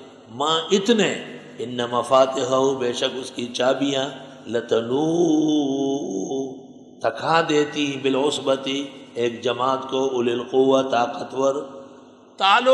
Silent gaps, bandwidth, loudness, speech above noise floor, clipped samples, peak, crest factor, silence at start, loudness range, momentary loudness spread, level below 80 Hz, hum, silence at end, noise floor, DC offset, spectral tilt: none; 11.5 kHz; -22 LUFS; 26 dB; under 0.1%; -4 dBFS; 18 dB; 0 s; 2 LU; 12 LU; -72 dBFS; none; 0 s; -46 dBFS; under 0.1%; -4 dB/octave